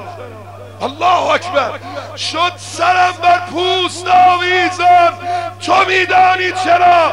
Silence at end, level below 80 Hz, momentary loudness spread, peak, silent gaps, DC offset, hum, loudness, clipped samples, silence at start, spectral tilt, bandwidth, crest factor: 0 s; -56 dBFS; 14 LU; -2 dBFS; none; 0.4%; 50 Hz at -35 dBFS; -12 LUFS; under 0.1%; 0 s; -3.5 dB/octave; 11.5 kHz; 12 dB